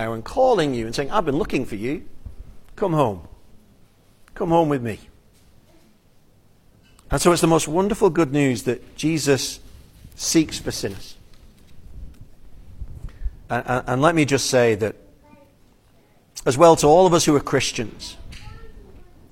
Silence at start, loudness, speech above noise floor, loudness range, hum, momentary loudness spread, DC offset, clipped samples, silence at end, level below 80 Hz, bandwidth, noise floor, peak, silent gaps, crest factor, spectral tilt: 0 s; -20 LUFS; 36 dB; 9 LU; none; 21 LU; under 0.1%; under 0.1%; 0.3 s; -42 dBFS; 16.5 kHz; -55 dBFS; -2 dBFS; none; 20 dB; -5 dB/octave